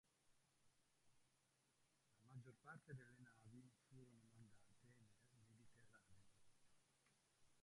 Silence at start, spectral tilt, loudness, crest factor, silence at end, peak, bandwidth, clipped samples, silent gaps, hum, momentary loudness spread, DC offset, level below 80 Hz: 0.05 s; -5.5 dB/octave; -65 LUFS; 22 dB; 0 s; -48 dBFS; 11 kHz; under 0.1%; none; none; 8 LU; under 0.1%; under -90 dBFS